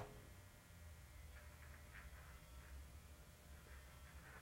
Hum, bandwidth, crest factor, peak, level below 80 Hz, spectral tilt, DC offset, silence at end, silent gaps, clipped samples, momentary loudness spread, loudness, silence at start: none; 16.5 kHz; 20 dB; -40 dBFS; -62 dBFS; -4.5 dB/octave; under 0.1%; 0 s; none; under 0.1%; 3 LU; -61 LUFS; 0 s